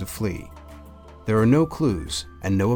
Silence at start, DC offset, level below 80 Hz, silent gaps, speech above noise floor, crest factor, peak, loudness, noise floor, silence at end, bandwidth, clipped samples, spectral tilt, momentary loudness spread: 0 s; under 0.1%; -42 dBFS; none; 22 dB; 16 dB; -6 dBFS; -23 LUFS; -44 dBFS; 0 s; 19.5 kHz; under 0.1%; -6.5 dB/octave; 23 LU